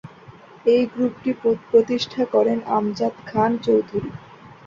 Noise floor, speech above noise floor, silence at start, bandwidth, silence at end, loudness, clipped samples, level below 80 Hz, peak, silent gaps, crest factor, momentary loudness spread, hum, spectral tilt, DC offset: -45 dBFS; 25 dB; 0.05 s; 7.4 kHz; 0.2 s; -21 LUFS; under 0.1%; -58 dBFS; -4 dBFS; none; 16 dB; 8 LU; none; -6.5 dB/octave; under 0.1%